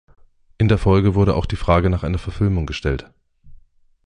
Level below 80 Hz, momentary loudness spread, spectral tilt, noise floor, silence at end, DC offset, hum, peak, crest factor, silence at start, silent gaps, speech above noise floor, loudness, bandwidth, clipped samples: -30 dBFS; 9 LU; -8 dB/octave; -50 dBFS; 0.5 s; under 0.1%; none; -2 dBFS; 16 dB; 0.6 s; none; 33 dB; -19 LUFS; 9.6 kHz; under 0.1%